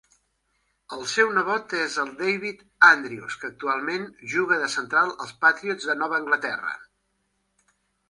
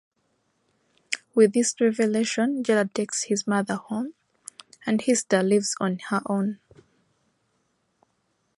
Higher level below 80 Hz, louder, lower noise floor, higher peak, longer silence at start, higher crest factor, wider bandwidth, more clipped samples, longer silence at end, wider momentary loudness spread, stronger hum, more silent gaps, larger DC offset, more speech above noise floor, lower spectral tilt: about the same, -72 dBFS vs -74 dBFS; about the same, -23 LUFS vs -24 LUFS; about the same, -73 dBFS vs -72 dBFS; first, -2 dBFS vs -6 dBFS; second, 0.9 s vs 1.1 s; about the same, 24 dB vs 20 dB; about the same, 11.5 kHz vs 11.5 kHz; neither; second, 1.25 s vs 2.05 s; about the same, 16 LU vs 15 LU; neither; neither; neither; about the same, 49 dB vs 49 dB; second, -2.5 dB/octave vs -4.5 dB/octave